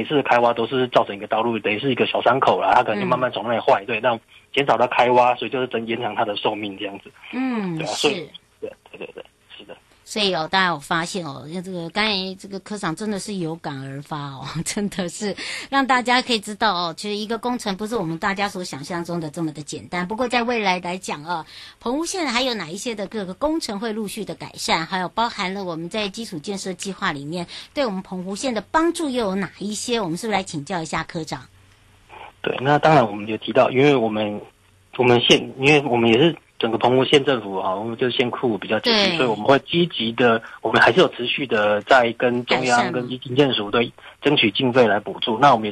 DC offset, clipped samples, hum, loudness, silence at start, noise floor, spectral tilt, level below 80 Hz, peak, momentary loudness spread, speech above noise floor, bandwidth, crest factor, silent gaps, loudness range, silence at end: under 0.1%; under 0.1%; none; -21 LUFS; 0 s; -53 dBFS; -4.5 dB/octave; -56 dBFS; -2 dBFS; 14 LU; 32 dB; 12.5 kHz; 18 dB; none; 8 LU; 0 s